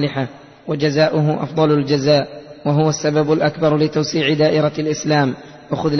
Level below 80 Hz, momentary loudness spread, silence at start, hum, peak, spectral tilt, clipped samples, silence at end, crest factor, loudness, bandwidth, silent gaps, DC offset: -52 dBFS; 11 LU; 0 s; none; -2 dBFS; -6 dB/octave; under 0.1%; 0 s; 14 dB; -17 LUFS; 6.4 kHz; none; under 0.1%